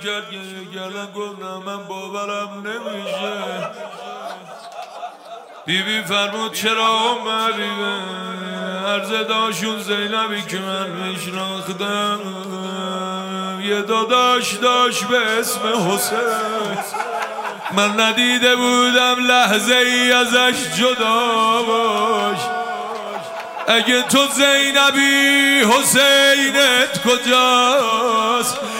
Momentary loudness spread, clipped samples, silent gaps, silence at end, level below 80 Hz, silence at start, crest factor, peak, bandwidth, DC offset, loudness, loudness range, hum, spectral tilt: 17 LU; under 0.1%; none; 0 s; -70 dBFS; 0 s; 18 dB; 0 dBFS; 16.5 kHz; under 0.1%; -16 LUFS; 14 LU; none; -2 dB/octave